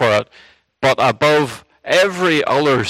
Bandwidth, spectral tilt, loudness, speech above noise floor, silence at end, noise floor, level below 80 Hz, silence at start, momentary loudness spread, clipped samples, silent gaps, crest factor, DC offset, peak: 15.5 kHz; -4.5 dB/octave; -15 LUFS; 33 dB; 0 s; -48 dBFS; -54 dBFS; 0 s; 9 LU; under 0.1%; none; 16 dB; under 0.1%; 0 dBFS